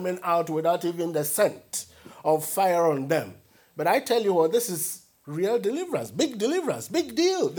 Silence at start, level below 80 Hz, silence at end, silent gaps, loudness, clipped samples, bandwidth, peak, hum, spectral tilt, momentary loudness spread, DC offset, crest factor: 0 s; -72 dBFS; 0 s; none; -25 LUFS; under 0.1%; over 20 kHz; -8 dBFS; none; -4 dB/octave; 11 LU; under 0.1%; 18 dB